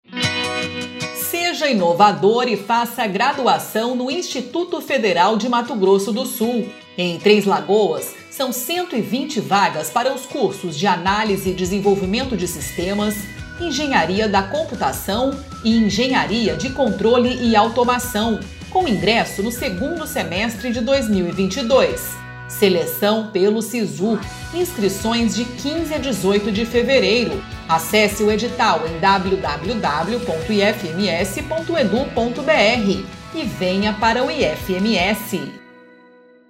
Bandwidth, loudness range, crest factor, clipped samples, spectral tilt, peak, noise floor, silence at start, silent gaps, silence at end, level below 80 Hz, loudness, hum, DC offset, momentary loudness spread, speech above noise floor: 16 kHz; 3 LU; 18 dB; under 0.1%; -4.5 dB/octave; 0 dBFS; -48 dBFS; 0.1 s; none; 0.85 s; -42 dBFS; -19 LUFS; none; under 0.1%; 8 LU; 30 dB